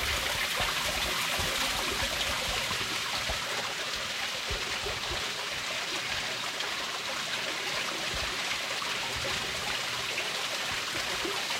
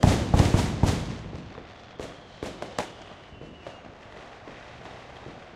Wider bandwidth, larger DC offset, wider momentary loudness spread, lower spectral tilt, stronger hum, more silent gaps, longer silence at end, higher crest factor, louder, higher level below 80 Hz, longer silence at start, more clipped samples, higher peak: first, 16 kHz vs 14 kHz; neither; second, 3 LU vs 23 LU; second, -1 dB/octave vs -6 dB/octave; neither; neither; about the same, 0 s vs 0.05 s; second, 16 dB vs 24 dB; second, -30 LUFS vs -27 LUFS; second, -50 dBFS vs -36 dBFS; about the same, 0 s vs 0 s; neither; second, -16 dBFS vs -4 dBFS